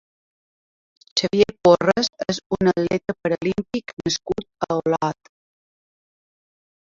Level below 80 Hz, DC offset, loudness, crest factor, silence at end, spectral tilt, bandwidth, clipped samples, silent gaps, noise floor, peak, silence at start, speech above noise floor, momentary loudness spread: -54 dBFS; under 0.1%; -21 LUFS; 20 dB; 1.75 s; -5 dB/octave; 7.8 kHz; under 0.1%; 2.46-2.50 s, 3.93-3.97 s; under -90 dBFS; -2 dBFS; 1.15 s; over 69 dB; 11 LU